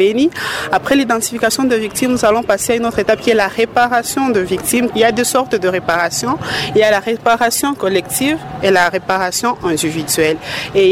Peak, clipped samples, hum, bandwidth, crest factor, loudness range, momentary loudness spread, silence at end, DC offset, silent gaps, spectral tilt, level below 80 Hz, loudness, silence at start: -2 dBFS; under 0.1%; none; 16.5 kHz; 12 dB; 1 LU; 4 LU; 0 s; under 0.1%; none; -3.5 dB/octave; -46 dBFS; -14 LUFS; 0 s